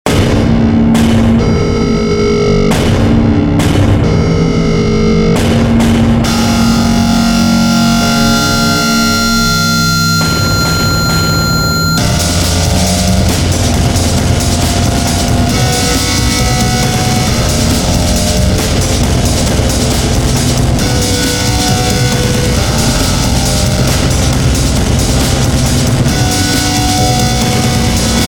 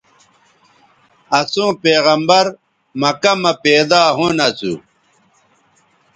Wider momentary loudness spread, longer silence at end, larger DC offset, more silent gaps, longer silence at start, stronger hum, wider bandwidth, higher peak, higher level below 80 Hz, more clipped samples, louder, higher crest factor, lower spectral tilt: second, 2 LU vs 10 LU; second, 0 s vs 1.35 s; neither; neither; second, 0.05 s vs 1.3 s; neither; first, over 20 kHz vs 9.6 kHz; about the same, 0 dBFS vs 0 dBFS; first, -18 dBFS vs -58 dBFS; neither; first, -10 LUFS vs -14 LUFS; second, 10 dB vs 16 dB; about the same, -4.5 dB/octave vs -3.5 dB/octave